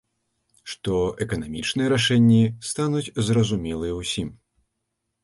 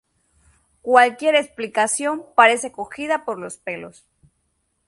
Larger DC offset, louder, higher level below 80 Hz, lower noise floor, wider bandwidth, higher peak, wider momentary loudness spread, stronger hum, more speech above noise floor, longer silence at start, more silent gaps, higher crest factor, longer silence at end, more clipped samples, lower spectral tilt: neither; second, -23 LUFS vs -19 LUFS; first, -46 dBFS vs -66 dBFS; first, -78 dBFS vs -70 dBFS; about the same, 11.5 kHz vs 11.5 kHz; second, -8 dBFS vs 0 dBFS; second, 12 LU vs 16 LU; neither; first, 56 dB vs 51 dB; second, 0.65 s vs 0.85 s; neither; second, 16 dB vs 22 dB; about the same, 0.9 s vs 1 s; neither; first, -5.5 dB/octave vs -2 dB/octave